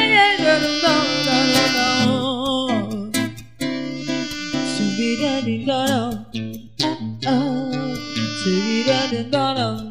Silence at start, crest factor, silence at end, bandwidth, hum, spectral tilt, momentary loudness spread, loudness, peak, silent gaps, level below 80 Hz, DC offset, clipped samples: 0 s; 16 dB; 0 s; 15.5 kHz; none; -4 dB/octave; 10 LU; -20 LUFS; -4 dBFS; none; -52 dBFS; 0.5%; under 0.1%